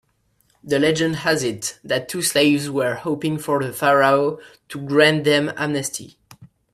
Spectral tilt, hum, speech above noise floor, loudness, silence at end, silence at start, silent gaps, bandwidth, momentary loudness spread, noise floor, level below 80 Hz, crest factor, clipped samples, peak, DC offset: -4 dB/octave; none; 44 dB; -19 LUFS; 0.25 s; 0.65 s; none; 15.5 kHz; 11 LU; -64 dBFS; -60 dBFS; 20 dB; under 0.1%; -2 dBFS; under 0.1%